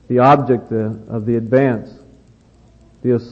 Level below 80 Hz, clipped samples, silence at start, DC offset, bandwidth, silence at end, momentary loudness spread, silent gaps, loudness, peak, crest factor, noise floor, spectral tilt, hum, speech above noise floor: -52 dBFS; under 0.1%; 0.1 s; under 0.1%; 7.2 kHz; 0 s; 12 LU; none; -17 LUFS; 0 dBFS; 16 dB; -49 dBFS; -9.5 dB/octave; none; 33 dB